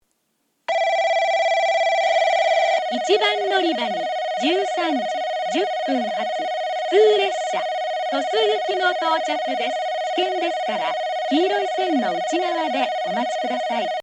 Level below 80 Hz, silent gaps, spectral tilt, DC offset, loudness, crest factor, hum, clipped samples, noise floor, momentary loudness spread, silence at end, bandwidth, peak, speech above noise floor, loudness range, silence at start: -82 dBFS; none; -2.5 dB/octave; under 0.1%; -21 LUFS; 16 dB; none; under 0.1%; -70 dBFS; 6 LU; 0 s; 10 kHz; -6 dBFS; 49 dB; 3 LU; 0.7 s